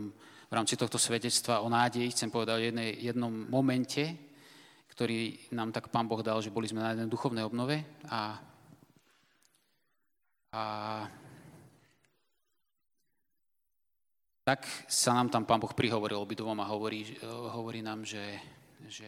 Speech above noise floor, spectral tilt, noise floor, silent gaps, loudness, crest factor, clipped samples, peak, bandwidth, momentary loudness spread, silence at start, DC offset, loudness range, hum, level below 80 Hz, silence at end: 55 dB; -4 dB/octave; -88 dBFS; none; -33 LUFS; 24 dB; under 0.1%; -12 dBFS; 16.5 kHz; 12 LU; 0 s; under 0.1%; 13 LU; none; -74 dBFS; 0 s